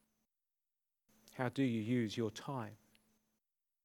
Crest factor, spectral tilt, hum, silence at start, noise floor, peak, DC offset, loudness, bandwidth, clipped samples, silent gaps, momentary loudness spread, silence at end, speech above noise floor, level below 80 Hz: 20 dB; -6.5 dB/octave; none; 1.25 s; under -90 dBFS; -22 dBFS; under 0.1%; -39 LUFS; 18.5 kHz; under 0.1%; none; 12 LU; 1.1 s; over 52 dB; -84 dBFS